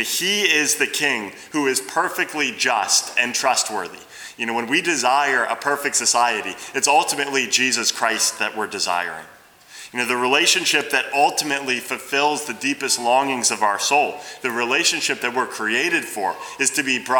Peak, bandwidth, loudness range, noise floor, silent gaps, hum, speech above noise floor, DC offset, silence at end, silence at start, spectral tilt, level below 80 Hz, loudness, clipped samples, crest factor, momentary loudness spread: -2 dBFS; over 20 kHz; 2 LU; -43 dBFS; none; none; 22 dB; under 0.1%; 0 s; 0 s; -0.5 dB/octave; -70 dBFS; -19 LUFS; under 0.1%; 20 dB; 9 LU